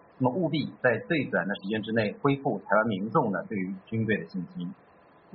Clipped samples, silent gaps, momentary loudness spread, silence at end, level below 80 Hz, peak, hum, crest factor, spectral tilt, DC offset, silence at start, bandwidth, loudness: under 0.1%; none; 9 LU; 0.6 s; -66 dBFS; -8 dBFS; none; 20 dB; -5.5 dB/octave; under 0.1%; 0.2 s; 5.4 kHz; -28 LUFS